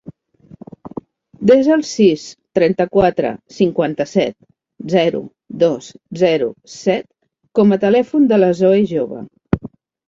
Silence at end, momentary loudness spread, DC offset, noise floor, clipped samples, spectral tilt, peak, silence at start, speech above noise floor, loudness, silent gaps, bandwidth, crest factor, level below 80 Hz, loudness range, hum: 0.4 s; 17 LU; under 0.1%; -45 dBFS; under 0.1%; -6.5 dB/octave; 0 dBFS; 0.85 s; 31 dB; -16 LUFS; none; 7.8 kHz; 16 dB; -46 dBFS; 4 LU; none